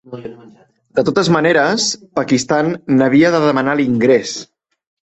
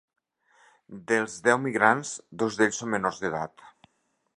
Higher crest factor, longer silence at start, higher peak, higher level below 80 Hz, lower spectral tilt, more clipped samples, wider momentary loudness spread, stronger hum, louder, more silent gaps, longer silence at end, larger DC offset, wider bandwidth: second, 16 dB vs 26 dB; second, 0.1 s vs 0.9 s; first, 0 dBFS vs -4 dBFS; first, -54 dBFS vs -68 dBFS; about the same, -5 dB/octave vs -4 dB/octave; neither; about the same, 14 LU vs 15 LU; neither; first, -14 LUFS vs -26 LUFS; neither; about the same, 0.6 s vs 0.7 s; neither; second, 8.2 kHz vs 11 kHz